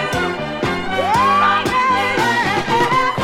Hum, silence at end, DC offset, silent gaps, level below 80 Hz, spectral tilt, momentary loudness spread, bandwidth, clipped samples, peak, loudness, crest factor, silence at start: none; 0 s; under 0.1%; none; -42 dBFS; -4.5 dB/octave; 7 LU; 16.5 kHz; under 0.1%; -4 dBFS; -16 LUFS; 14 dB; 0 s